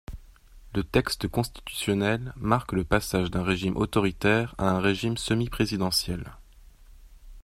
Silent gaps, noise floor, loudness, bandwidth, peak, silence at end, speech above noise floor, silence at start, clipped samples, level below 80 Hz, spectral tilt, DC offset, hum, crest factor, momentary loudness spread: none; -51 dBFS; -27 LUFS; 16 kHz; -6 dBFS; 0 s; 25 dB; 0.1 s; under 0.1%; -44 dBFS; -5 dB/octave; under 0.1%; none; 22 dB; 8 LU